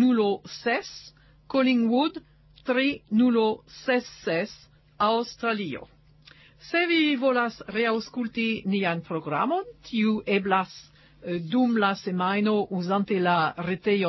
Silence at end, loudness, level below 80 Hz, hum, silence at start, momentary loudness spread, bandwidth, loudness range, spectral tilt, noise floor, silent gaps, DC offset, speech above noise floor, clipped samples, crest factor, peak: 0 s; -25 LUFS; -64 dBFS; none; 0 s; 10 LU; 6.2 kHz; 2 LU; -6 dB/octave; -54 dBFS; none; under 0.1%; 29 dB; under 0.1%; 16 dB; -10 dBFS